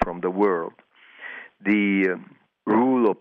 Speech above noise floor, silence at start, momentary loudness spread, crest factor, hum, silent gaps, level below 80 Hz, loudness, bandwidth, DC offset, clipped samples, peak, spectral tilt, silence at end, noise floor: 20 dB; 0 s; 18 LU; 14 dB; none; none; -52 dBFS; -22 LUFS; 5.2 kHz; under 0.1%; under 0.1%; -8 dBFS; -9 dB/octave; 0.05 s; -42 dBFS